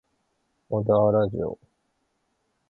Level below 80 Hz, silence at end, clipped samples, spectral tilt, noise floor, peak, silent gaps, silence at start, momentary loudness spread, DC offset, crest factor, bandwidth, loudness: -54 dBFS; 1.15 s; under 0.1%; -11 dB/octave; -74 dBFS; -8 dBFS; none; 0.7 s; 13 LU; under 0.1%; 18 dB; 4.1 kHz; -24 LUFS